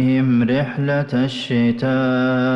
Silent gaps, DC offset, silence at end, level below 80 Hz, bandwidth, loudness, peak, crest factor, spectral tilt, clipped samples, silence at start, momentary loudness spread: none; under 0.1%; 0 s; -54 dBFS; 8 kHz; -18 LUFS; -10 dBFS; 8 dB; -8 dB/octave; under 0.1%; 0 s; 4 LU